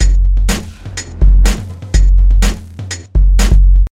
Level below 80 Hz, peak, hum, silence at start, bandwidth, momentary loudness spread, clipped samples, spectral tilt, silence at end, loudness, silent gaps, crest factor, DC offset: -10 dBFS; 0 dBFS; none; 0 s; 11.5 kHz; 14 LU; under 0.1%; -5 dB/octave; 0.05 s; -13 LUFS; none; 10 dB; under 0.1%